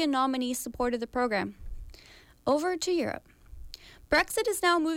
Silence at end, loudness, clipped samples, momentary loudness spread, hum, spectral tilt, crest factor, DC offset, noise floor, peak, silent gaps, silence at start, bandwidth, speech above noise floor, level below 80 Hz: 0 s; -29 LUFS; under 0.1%; 22 LU; none; -3 dB/octave; 16 dB; under 0.1%; -55 dBFS; -14 dBFS; none; 0 s; 17 kHz; 27 dB; -50 dBFS